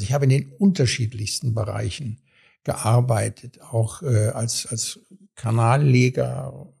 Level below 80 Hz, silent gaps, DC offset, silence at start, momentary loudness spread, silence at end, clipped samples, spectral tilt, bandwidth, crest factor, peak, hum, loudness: -52 dBFS; none; under 0.1%; 0 s; 14 LU; 0.15 s; under 0.1%; -5.5 dB/octave; 13.5 kHz; 18 dB; -4 dBFS; none; -22 LUFS